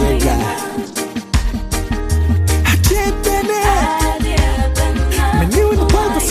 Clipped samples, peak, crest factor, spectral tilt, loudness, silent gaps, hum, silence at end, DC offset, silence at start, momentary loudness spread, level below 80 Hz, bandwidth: under 0.1%; -2 dBFS; 12 dB; -5 dB/octave; -16 LUFS; none; none; 0 s; under 0.1%; 0 s; 7 LU; -18 dBFS; 15.5 kHz